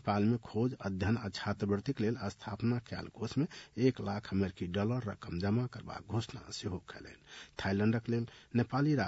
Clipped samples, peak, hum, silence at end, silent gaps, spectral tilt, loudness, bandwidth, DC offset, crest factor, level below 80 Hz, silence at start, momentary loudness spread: under 0.1%; -16 dBFS; none; 0 s; none; -7 dB/octave; -36 LUFS; 8 kHz; under 0.1%; 18 dB; -64 dBFS; 0.05 s; 10 LU